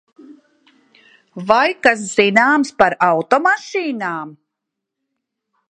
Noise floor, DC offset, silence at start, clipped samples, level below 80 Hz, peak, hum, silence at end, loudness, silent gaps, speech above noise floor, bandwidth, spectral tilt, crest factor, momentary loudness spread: -80 dBFS; under 0.1%; 0.3 s; under 0.1%; -58 dBFS; 0 dBFS; none; 1.4 s; -15 LUFS; none; 65 dB; 11 kHz; -4 dB/octave; 18 dB; 12 LU